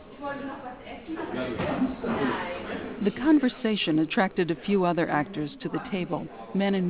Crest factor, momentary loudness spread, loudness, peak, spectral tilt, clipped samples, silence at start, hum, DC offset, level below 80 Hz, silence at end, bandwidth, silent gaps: 18 dB; 13 LU; -28 LUFS; -10 dBFS; -5 dB/octave; under 0.1%; 0 s; none; 0.1%; -56 dBFS; 0 s; 4 kHz; none